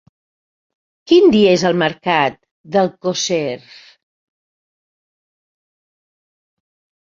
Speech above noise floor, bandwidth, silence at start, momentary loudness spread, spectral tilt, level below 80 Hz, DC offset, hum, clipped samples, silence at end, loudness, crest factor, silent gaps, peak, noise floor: over 75 dB; 7.4 kHz; 1.1 s; 10 LU; -4.5 dB/octave; -58 dBFS; under 0.1%; none; under 0.1%; 3.45 s; -15 LUFS; 18 dB; 2.51-2.64 s; -2 dBFS; under -90 dBFS